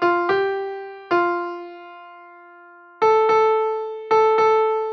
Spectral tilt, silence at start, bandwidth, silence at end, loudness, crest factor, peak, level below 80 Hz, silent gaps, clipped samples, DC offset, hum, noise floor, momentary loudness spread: -5 dB/octave; 0 s; 6.4 kHz; 0 s; -19 LUFS; 12 dB; -8 dBFS; -70 dBFS; none; under 0.1%; under 0.1%; none; -46 dBFS; 18 LU